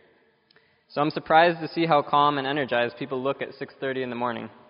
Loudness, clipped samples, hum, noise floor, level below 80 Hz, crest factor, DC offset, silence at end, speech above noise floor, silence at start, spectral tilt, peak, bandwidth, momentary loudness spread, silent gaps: -24 LUFS; under 0.1%; none; -62 dBFS; -68 dBFS; 20 dB; under 0.1%; 0.2 s; 38 dB; 0.9 s; -3 dB/octave; -4 dBFS; 5.4 kHz; 12 LU; none